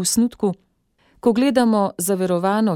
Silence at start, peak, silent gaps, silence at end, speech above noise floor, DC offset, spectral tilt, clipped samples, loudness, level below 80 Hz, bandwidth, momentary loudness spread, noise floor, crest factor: 0 s; -4 dBFS; none; 0 s; 43 dB; under 0.1%; -5 dB/octave; under 0.1%; -19 LUFS; -56 dBFS; 17 kHz; 8 LU; -62 dBFS; 16 dB